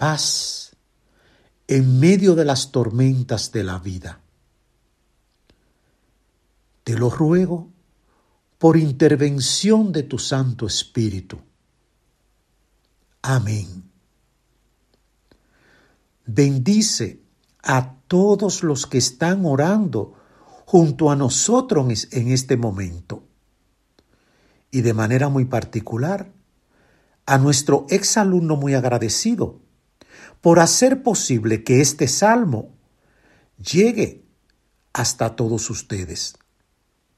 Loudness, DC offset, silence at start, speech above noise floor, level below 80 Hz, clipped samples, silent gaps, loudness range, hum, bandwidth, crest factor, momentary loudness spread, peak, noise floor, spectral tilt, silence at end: -19 LUFS; under 0.1%; 0 s; 49 dB; -54 dBFS; under 0.1%; none; 11 LU; none; 13.5 kHz; 20 dB; 14 LU; 0 dBFS; -67 dBFS; -5 dB/octave; 0.85 s